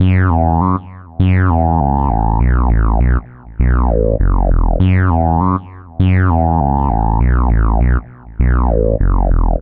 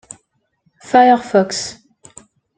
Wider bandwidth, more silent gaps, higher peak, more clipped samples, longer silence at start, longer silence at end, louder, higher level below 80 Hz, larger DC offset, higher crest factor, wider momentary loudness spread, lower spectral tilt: second, 3.7 kHz vs 9.4 kHz; neither; about the same, 0 dBFS vs -2 dBFS; neither; second, 0 s vs 0.9 s; second, 0 s vs 0.85 s; about the same, -14 LUFS vs -14 LUFS; first, -16 dBFS vs -60 dBFS; first, 0.4% vs under 0.1%; about the same, 12 dB vs 16 dB; second, 6 LU vs 13 LU; first, -12 dB/octave vs -4 dB/octave